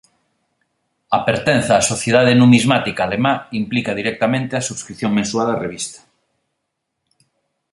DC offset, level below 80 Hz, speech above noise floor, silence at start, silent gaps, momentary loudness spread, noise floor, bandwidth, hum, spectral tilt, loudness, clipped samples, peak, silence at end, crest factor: under 0.1%; -52 dBFS; 59 dB; 1.1 s; none; 11 LU; -75 dBFS; 11.5 kHz; none; -5 dB/octave; -17 LUFS; under 0.1%; 0 dBFS; 1.75 s; 18 dB